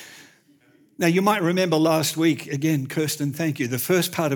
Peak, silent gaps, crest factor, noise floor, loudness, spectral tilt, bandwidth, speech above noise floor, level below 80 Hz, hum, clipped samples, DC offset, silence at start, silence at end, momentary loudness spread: -6 dBFS; none; 18 dB; -57 dBFS; -22 LUFS; -5 dB/octave; over 20 kHz; 36 dB; -74 dBFS; none; under 0.1%; under 0.1%; 0 s; 0 s; 6 LU